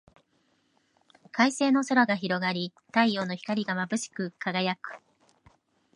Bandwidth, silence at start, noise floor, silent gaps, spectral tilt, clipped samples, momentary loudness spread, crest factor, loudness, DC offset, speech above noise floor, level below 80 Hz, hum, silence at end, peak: 11.5 kHz; 1.35 s; -70 dBFS; none; -4.5 dB/octave; under 0.1%; 12 LU; 22 dB; -27 LUFS; under 0.1%; 43 dB; -76 dBFS; none; 1 s; -8 dBFS